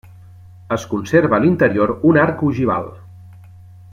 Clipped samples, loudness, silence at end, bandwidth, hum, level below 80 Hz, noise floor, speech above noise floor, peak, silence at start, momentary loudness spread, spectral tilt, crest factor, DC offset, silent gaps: under 0.1%; -16 LUFS; 0.55 s; 12 kHz; none; -52 dBFS; -41 dBFS; 25 dB; -2 dBFS; 0.7 s; 10 LU; -7.5 dB/octave; 16 dB; under 0.1%; none